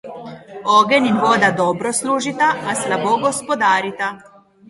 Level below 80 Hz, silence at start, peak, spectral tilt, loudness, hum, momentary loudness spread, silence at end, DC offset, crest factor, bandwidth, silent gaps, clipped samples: -60 dBFS; 0.05 s; 0 dBFS; -3.5 dB/octave; -17 LUFS; none; 11 LU; 0.5 s; under 0.1%; 18 dB; 11.5 kHz; none; under 0.1%